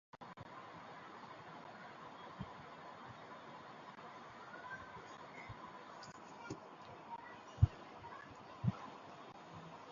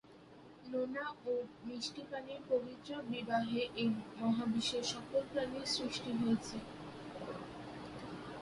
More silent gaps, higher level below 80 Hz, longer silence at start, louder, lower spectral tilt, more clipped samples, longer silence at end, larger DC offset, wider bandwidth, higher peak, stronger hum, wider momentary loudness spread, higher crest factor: neither; first, -56 dBFS vs -68 dBFS; about the same, 0.15 s vs 0.05 s; second, -48 LUFS vs -39 LUFS; first, -6 dB/octave vs -4.5 dB/octave; neither; about the same, 0 s vs 0 s; neither; second, 7.2 kHz vs 11.5 kHz; first, -18 dBFS vs -22 dBFS; neither; about the same, 12 LU vs 13 LU; first, 30 dB vs 18 dB